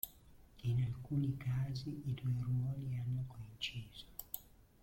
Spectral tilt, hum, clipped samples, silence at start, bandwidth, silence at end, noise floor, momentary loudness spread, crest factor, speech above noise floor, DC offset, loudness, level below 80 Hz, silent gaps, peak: -6 dB/octave; none; under 0.1%; 0.05 s; 16.5 kHz; 0.35 s; -61 dBFS; 11 LU; 18 dB; 22 dB; under 0.1%; -41 LUFS; -60 dBFS; none; -22 dBFS